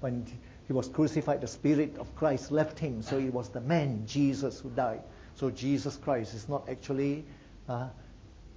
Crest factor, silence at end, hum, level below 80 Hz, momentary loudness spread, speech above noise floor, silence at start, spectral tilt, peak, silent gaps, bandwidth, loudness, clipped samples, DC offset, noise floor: 18 dB; 0.05 s; none; -54 dBFS; 11 LU; 20 dB; 0 s; -7 dB/octave; -14 dBFS; none; 8 kHz; -32 LUFS; under 0.1%; under 0.1%; -51 dBFS